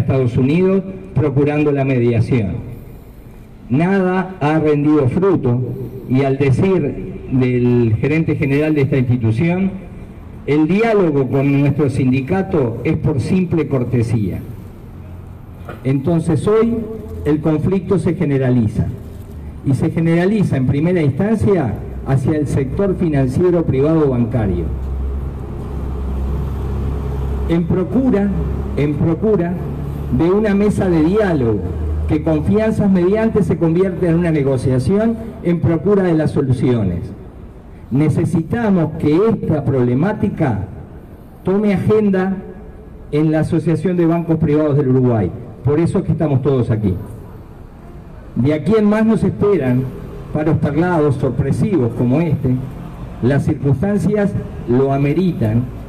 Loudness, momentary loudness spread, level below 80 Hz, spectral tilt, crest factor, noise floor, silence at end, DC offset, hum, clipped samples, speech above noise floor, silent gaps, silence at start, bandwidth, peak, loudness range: -16 LUFS; 12 LU; -32 dBFS; -9 dB/octave; 8 dB; -36 dBFS; 0 s; under 0.1%; none; under 0.1%; 22 dB; none; 0 s; 10.5 kHz; -6 dBFS; 3 LU